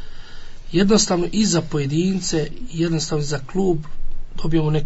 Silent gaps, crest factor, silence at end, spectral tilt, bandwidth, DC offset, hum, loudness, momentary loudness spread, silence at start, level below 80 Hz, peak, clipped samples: none; 16 dB; 0 s; -5 dB/octave; 8 kHz; under 0.1%; none; -21 LUFS; 12 LU; 0 s; -32 dBFS; -4 dBFS; under 0.1%